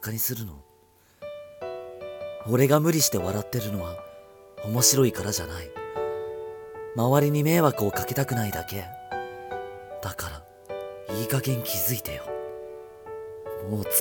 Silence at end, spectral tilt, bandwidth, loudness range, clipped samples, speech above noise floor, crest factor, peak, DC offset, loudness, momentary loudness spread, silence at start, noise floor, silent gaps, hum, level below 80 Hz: 0 s; -4.5 dB/octave; 19 kHz; 7 LU; under 0.1%; 34 dB; 22 dB; -6 dBFS; under 0.1%; -26 LUFS; 19 LU; 0 s; -59 dBFS; none; none; -54 dBFS